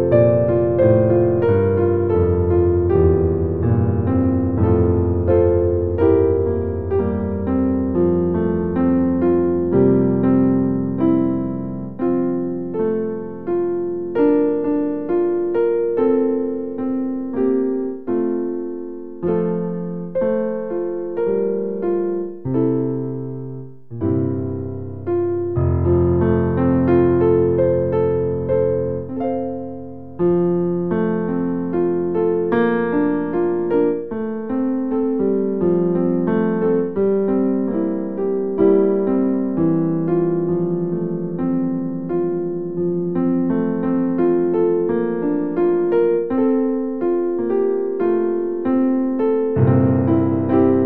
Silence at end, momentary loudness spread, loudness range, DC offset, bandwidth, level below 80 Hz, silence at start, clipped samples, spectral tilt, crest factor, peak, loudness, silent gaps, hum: 0 s; 8 LU; 5 LU; 1%; 3.8 kHz; -40 dBFS; 0 s; under 0.1%; -13 dB/octave; 16 dB; -2 dBFS; -19 LUFS; none; none